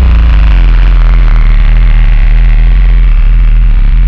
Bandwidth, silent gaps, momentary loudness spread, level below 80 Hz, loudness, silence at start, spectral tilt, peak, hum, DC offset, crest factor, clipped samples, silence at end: 4.4 kHz; none; 2 LU; -4 dBFS; -9 LUFS; 0 s; -8 dB/octave; 0 dBFS; none; under 0.1%; 4 dB; under 0.1%; 0 s